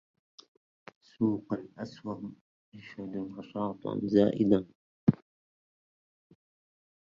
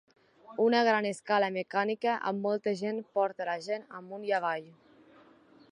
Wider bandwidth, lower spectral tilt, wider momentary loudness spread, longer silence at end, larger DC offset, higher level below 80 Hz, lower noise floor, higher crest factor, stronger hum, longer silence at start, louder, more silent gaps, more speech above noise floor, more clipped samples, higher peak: second, 7 kHz vs 11 kHz; first, -9 dB/octave vs -5 dB/octave; first, 18 LU vs 12 LU; first, 1.85 s vs 1 s; neither; first, -66 dBFS vs -84 dBFS; first, under -90 dBFS vs -59 dBFS; first, 24 dB vs 18 dB; neither; first, 1.2 s vs 0.5 s; about the same, -31 LUFS vs -30 LUFS; first, 2.41-2.72 s, 4.75-5.07 s vs none; first, over 59 dB vs 29 dB; neither; first, -8 dBFS vs -14 dBFS